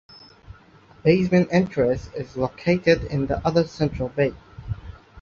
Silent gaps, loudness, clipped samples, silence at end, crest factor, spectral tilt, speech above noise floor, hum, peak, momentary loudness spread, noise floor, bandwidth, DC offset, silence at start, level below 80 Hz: none; -22 LUFS; under 0.1%; 0 s; 18 dB; -7.5 dB/octave; 30 dB; none; -4 dBFS; 16 LU; -51 dBFS; 7.2 kHz; under 0.1%; 0.5 s; -42 dBFS